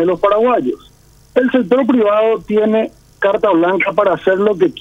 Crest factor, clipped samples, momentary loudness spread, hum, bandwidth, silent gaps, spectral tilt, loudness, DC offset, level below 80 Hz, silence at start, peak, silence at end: 14 dB; under 0.1%; 6 LU; none; 11.5 kHz; none; -7 dB/octave; -14 LUFS; under 0.1%; -50 dBFS; 0 s; 0 dBFS; 0 s